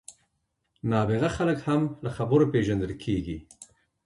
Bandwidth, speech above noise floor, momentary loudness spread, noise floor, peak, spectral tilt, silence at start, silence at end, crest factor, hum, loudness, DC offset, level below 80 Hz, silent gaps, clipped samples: 11.5 kHz; 52 dB; 10 LU; -77 dBFS; -10 dBFS; -7.5 dB/octave; 0.1 s; 0.4 s; 18 dB; none; -26 LUFS; under 0.1%; -48 dBFS; none; under 0.1%